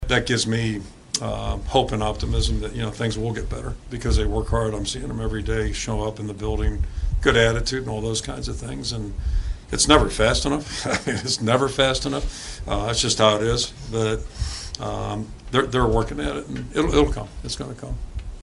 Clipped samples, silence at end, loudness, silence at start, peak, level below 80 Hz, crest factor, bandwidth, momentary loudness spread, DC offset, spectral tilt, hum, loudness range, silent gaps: under 0.1%; 0 s; -23 LUFS; 0 s; 0 dBFS; -30 dBFS; 22 dB; 11.5 kHz; 12 LU; under 0.1%; -4 dB/octave; none; 5 LU; none